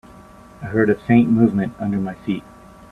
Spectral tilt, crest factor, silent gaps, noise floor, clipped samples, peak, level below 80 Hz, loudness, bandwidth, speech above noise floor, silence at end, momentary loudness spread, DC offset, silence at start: -9 dB/octave; 18 dB; none; -43 dBFS; under 0.1%; -2 dBFS; -50 dBFS; -19 LUFS; 4.2 kHz; 25 dB; 0.5 s; 12 LU; under 0.1%; 0.6 s